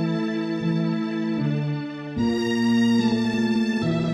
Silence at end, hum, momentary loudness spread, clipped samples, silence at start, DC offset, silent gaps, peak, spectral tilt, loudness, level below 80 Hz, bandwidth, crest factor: 0 s; none; 6 LU; under 0.1%; 0 s; under 0.1%; none; -10 dBFS; -7 dB/octave; -23 LUFS; -54 dBFS; 10 kHz; 12 dB